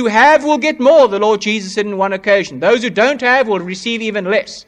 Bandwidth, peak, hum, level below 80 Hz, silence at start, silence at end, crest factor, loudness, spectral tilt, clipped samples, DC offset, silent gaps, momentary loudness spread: 10.5 kHz; 0 dBFS; none; -56 dBFS; 0 s; 0.05 s; 12 dB; -13 LUFS; -4 dB/octave; under 0.1%; under 0.1%; none; 9 LU